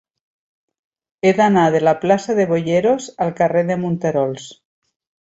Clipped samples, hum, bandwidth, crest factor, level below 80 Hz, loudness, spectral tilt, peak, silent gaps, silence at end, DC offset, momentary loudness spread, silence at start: under 0.1%; none; 8 kHz; 16 dB; -60 dBFS; -17 LUFS; -6.5 dB/octave; -2 dBFS; none; 0.8 s; under 0.1%; 7 LU; 1.25 s